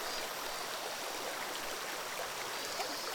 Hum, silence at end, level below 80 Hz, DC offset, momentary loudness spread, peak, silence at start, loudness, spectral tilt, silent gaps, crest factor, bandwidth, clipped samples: none; 0 s; -66 dBFS; under 0.1%; 2 LU; -22 dBFS; 0 s; -38 LUFS; -0.5 dB/octave; none; 16 dB; over 20 kHz; under 0.1%